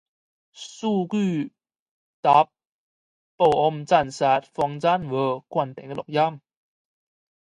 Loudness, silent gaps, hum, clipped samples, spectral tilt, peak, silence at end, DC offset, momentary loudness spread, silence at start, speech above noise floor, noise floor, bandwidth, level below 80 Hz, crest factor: -23 LUFS; 1.79-2.23 s, 2.72-3.38 s; none; under 0.1%; -6 dB/octave; -4 dBFS; 1.1 s; under 0.1%; 11 LU; 0.6 s; over 68 dB; under -90 dBFS; 11 kHz; -62 dBFS; 20 dB